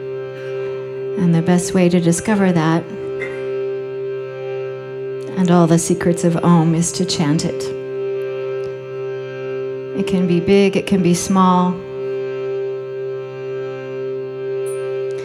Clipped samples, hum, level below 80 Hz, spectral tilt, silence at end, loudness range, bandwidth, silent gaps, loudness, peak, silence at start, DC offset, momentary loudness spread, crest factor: under 0.1%; none; -52 dBFS; -6 dB/octave; 0 s; 6 LU; 13.5 kHz; none; -19 LUFS; -2 dBFS; 0 s; under 0.1%; 12 LU; 16 dB